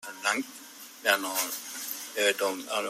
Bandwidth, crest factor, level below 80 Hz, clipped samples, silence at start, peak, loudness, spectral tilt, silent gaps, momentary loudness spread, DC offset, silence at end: 16 kHz; 22 dB; -84 dBFS; under 0.1%; 0 s; -8 dBFS; -29 LUFS; 0 dB/octave; none; 13 LU; under 0.1%; 0 s